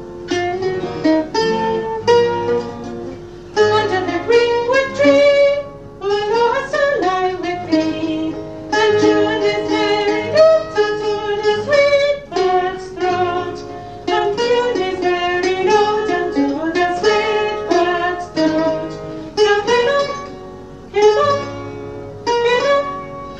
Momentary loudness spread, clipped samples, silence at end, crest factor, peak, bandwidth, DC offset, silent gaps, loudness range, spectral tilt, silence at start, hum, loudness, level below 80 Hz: 14 LU; under 0.1%; 0 s; 16 dB; 0 dBFS; 8.6 kHz; 0.3%; none; 3 LU; -4.5 dB/octave; 0 s; none; -16 LUFS; -46 dBFS